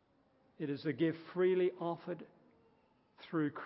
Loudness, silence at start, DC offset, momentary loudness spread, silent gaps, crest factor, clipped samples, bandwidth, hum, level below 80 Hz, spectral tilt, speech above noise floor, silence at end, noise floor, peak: -37 LUFS; 0.6 s; under 0.1%; 14 LU; none; 16 dB; under 0.1%; 5.6 kHz; none; -84 dBFS; -6 dB/octave; 36 dB; 0 s; -72 dBFS; -22 dBFS